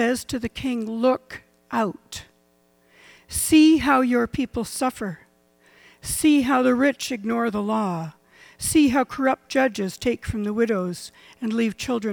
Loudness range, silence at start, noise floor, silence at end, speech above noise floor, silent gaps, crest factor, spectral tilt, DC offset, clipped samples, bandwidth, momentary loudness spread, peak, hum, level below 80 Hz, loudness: 3 LU; 0 s; -62 dBFS; 0 s; 40 dB; none; 16 dB; -4.5 dB/octave; under 0.1%; under 0.1%; 18.5 kHz; 15 LU; -6 dBFS; none; -48 dBFS; -22 LUFS